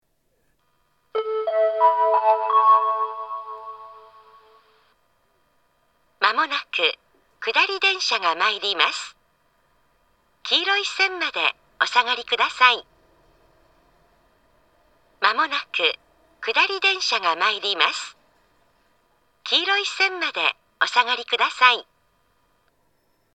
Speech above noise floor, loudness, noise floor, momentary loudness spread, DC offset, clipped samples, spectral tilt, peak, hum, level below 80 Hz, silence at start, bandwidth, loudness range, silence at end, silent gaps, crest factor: 48 dB; -20 LUFS; -69 dBFS; 14 LU; under 0.1%; under 0.1%; 0.5 dB/octave; 0 dBFS; none; -72 dBFS; 1.15 s; 9 kHz; 6 LU; 1.5 s; none; 24 dB